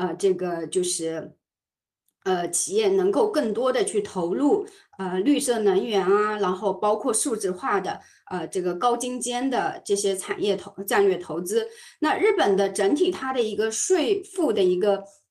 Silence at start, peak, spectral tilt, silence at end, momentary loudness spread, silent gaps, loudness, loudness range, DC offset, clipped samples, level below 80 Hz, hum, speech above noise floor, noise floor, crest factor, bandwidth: 0 s; -8 dBFS; -3.5 dB/octave; 0.2 s; 8 LU; none; -24 LUFS; 3 LU; under 0.1%; under 0.1%; -68 dBFS; none; over 66 dB; under -90 dBFS; 16 dB; 13 kHz